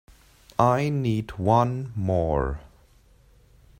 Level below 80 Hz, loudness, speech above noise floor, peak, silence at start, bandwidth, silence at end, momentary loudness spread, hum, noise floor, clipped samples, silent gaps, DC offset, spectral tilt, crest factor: -42 dBFS; -24 LUFS; 33 dB; -4 dBFS; 0.6 s; 15.5 kHz; 1.15 s; 10 LU; none; -56 dBFS; under 0.1%; none; under 0.1%; -8 dB/octave; 22 dB